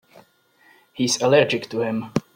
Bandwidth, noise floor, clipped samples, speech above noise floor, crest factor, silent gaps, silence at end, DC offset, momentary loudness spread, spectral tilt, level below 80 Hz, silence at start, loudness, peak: 16.5 kHz; -57 dBFS; under 0.1%; 37 dB; 20 dB; none; 0.15 s; under 0.1%; 9 LU; -4 dB/octave; -62 dBFS; 0.95 s; -21 LUFS; -4 dBFS